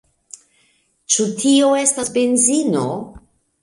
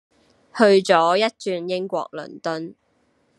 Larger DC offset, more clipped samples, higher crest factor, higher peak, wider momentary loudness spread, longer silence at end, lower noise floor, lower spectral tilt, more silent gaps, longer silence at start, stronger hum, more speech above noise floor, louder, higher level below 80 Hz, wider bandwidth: neither; neither; about the same, 18 dB vs 20 dB; about the same, 0 dBFS vs 0 dBFS; second, 11 LU vs 17 LU; second, 0.45 s vs 0.65 s; about the same, -61 dBFS vs -64 dBFS; second, -3 dB/octave vs -4.5 dB/octave; neither; first, 1.1 s vs 0.55 s; neither; about the same, 44 dB vs 45 dB; first, -16 LUFS vs -20 LUFS; first, -56 dBFS vs -74 dBFS; about the same, 11.5 kHz vs 11.5 kHz